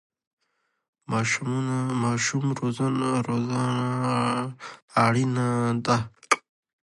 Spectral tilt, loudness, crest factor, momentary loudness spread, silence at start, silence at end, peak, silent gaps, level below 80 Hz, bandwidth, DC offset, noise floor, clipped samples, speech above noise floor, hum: -5.5 dB/octave; -25 LUFS; 20 dB; 4 LU; 1.1 s; 0.45 s; -6 dBFS; 4.82-4.88 s; -62 dBFS; 11.5 kHz; under 0.1%; -75 dBFS; under 0.1%; 50 dB; none